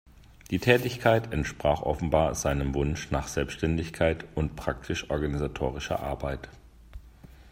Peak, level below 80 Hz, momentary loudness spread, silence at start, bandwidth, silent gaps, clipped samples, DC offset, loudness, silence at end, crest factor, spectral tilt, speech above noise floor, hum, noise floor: -6 dBFS; -40 dBFS; 9 LU; 0.3 s; 16 kHz; none; under 0.1%; under 0.1%; -28 LUFS; 0 s; 24 dB; -5.5 dB/octave; 23 dB; none; -50 dBFS